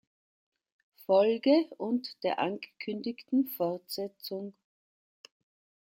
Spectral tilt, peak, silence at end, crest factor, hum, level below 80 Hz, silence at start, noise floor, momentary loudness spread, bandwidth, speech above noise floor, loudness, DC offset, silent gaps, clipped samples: -5.5 dB/octave; -12 dBFS; 1.4 s; 20 dB; none; -82 dBFS; 1.1 s; under -90 dBFS; 14 LU; 16.5 kHz; over 60 dB; -31 LUFS; under 0.1%; none; under 0.1%